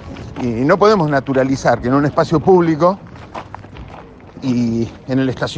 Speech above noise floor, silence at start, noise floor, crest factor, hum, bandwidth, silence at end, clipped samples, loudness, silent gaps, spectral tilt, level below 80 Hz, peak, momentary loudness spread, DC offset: 22 dB; 0 s; -37 dBFS; 16 dB; none; 9.2 kHz; 0 s; under 0.1%; -15 LUFS; none; -7 dB/octave; -42 dBFS; 0 dBFS; 20 LU; under 0.1%